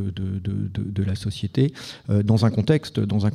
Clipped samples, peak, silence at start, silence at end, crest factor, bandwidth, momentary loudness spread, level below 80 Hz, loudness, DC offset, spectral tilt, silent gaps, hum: under 0.1%; -6 dBFS; 0 s; 0 s; 18 dB; 11.5 kHz; 8 LU; -48 dBFS; -23 LUFS; under 0.1%; -7.5 dB/octave; none; none